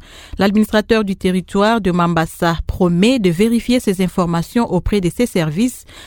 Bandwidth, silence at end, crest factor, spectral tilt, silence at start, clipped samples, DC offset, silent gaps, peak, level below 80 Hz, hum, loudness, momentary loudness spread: 18.5 kHz; 0 s; 16 dB; -6 dB/octave; 0.15 s; under 0.1%; under 0.1%; none; 0 dBFS; -32 dBFS; none; -16 LUFS; 5 LU